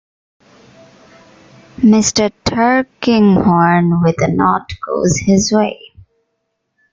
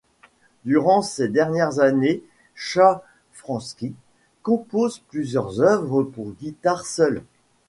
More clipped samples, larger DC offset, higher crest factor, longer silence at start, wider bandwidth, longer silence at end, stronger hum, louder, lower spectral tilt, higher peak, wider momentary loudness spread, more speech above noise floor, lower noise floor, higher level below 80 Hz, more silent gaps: neither; neither; second, 14 dB vs 20 dB; first, 1.8 s vs 0.65 s; second, 9 kHz vs 11.5 kHz; first, 1.15 s vs 0.45 s; neither; first, -13 LUFS vs -21 LUFS; about the same, -5 dB/octave vs -5.5 dB/octave; about the same, 0 dBFS vs -2 dBFS; second, 7 LU vs 15 LU; first, 58 dB vs 36 dB; first, -70 dBFS vs -57 dBFS; first, -44 dBFS vs -60 dBFS; neither